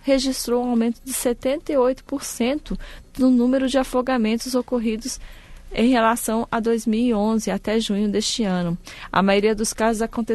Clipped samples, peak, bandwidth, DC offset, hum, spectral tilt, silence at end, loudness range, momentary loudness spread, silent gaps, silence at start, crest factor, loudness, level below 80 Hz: under 0.1%; -6 dBFS; 12.5 kHz; under 0.1%; none; -4.5 dB/octave; 0 s; 1 LU; 10 LU; none; 0.05 s; 16 dB; -21 LUFS; -42 dBFS